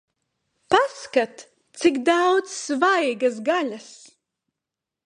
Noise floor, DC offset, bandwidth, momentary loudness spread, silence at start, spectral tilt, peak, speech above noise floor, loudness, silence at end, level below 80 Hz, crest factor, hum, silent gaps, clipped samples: -86 dBFS; under 0.1%; 10.5 kHz; 8 LU; 0.7 s; -2.5 dB/octave; -2 dBFS; 65 dB; -22 LUFS; 1.1 s; -68 dBFS; 22 dB; none; none; under 0.1%